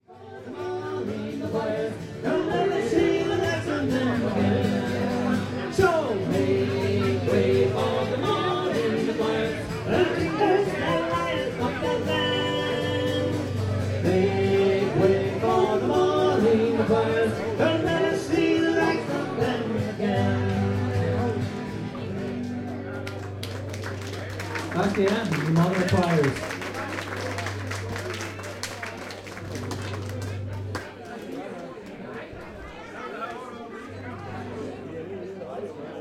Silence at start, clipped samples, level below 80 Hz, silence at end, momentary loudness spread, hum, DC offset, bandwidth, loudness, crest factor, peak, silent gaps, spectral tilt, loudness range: 0.1 s; under 0.1%; -54 dBFS; 0 s; 14 LU; none; under 0.1%; 15 kHz; -25 LUFS; 18 dB; -8 dBFS; none; -6 dB/octave; 13 LU